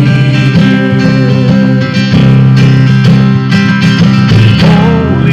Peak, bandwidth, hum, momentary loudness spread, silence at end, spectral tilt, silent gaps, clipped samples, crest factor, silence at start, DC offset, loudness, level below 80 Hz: 0 dBFS; 7.8 kHz; none; 3 LU; 0 s; -7.5 dB/octave; none; 0.1%; 6 dB; 0 s; under 0.1%; -6 LUFS; -30 dBFS